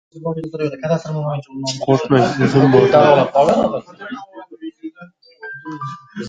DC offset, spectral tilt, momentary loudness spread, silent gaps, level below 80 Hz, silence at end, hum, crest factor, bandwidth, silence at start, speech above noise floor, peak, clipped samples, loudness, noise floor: under 0.1%; -6.5 dB/octave; 22 LU; none; -52 dBFS; 0 s; none; 16 dB; 9.4 kHz; 0.15 s; 28 dB; 0 dBFS; under 0.1%; -15 LUFS; -43 dBFS